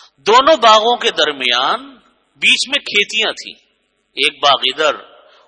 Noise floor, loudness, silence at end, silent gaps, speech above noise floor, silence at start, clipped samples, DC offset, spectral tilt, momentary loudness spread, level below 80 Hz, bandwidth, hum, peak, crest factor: -63 dBFS; -13 LUFS; 0.45 s; none; 49 dB; 0.25 s; under 0.1%; under 0.1%; -0.5 dB/octave; 12 LU; -58 dBFS; 12 kHz; none; 0 dBFS; 16 dB